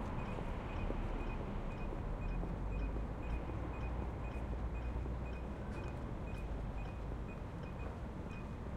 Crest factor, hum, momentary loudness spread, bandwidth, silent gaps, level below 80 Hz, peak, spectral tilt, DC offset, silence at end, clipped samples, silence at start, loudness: 16 dB; none; 3 LU; 9.4 kHz; none; -44 dBFS; -24 dBFS; -8 dB/octave; under 0.1%; 0 s; under 0.1%; 0 s; -44 LUFS